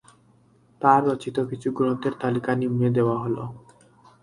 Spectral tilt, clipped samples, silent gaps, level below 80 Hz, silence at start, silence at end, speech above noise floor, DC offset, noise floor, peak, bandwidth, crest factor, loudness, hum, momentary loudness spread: -8 dB/octave; under 0.1%; none; -62 dBFS; 0.8 s; 0.65 s; 36 dB; under 0.1%; -58 dBFS; -2 dBFS; 11.5 kHz; 22 dB; -24 LUFS; none; 9 LU